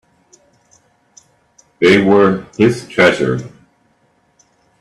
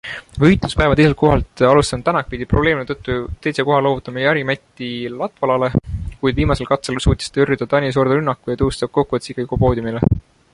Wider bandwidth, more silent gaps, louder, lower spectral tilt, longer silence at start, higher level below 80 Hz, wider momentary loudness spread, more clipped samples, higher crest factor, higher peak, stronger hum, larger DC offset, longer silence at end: about the same, 12 kHz vs 11.5 kHz; neither; first, -13 LUFS vs -18 LUFS; about the same, -6 dB/octave vs -6.5 dB/octave; first, 1.8 s vs 0.05 s; second, -52 dBFS vs -30 dBFS; about the same, 10 LU vs 10 LU; neither; about the same, 16 dB vs 16 dB; about the same, 0 dBFS vs -2 dBFS; neither; neither; first, 1.3 s vs 0.35 s